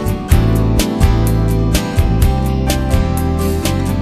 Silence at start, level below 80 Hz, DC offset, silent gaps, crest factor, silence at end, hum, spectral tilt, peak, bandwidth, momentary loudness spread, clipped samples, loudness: 0 s; -18 dBFS; under 0.1%; none; 14 dB; 0 s; none; -6 dB/octave; 0 dBFS; 14 kHz; 3 LU; under 0.1%; -15 LUFS